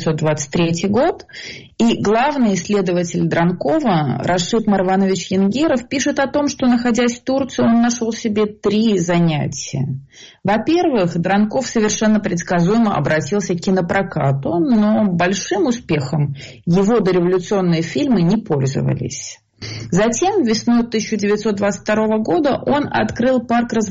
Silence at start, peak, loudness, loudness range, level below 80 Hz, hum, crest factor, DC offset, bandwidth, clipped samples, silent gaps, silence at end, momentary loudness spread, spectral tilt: 0 s; -6 dBFS; -17 LUFS; 1 LU; -46 dBFS; none; 10 dB; under 0.1%; 8 kHz; under 0.1%; none; 0 s; 5 LU; -5.5 dB/octave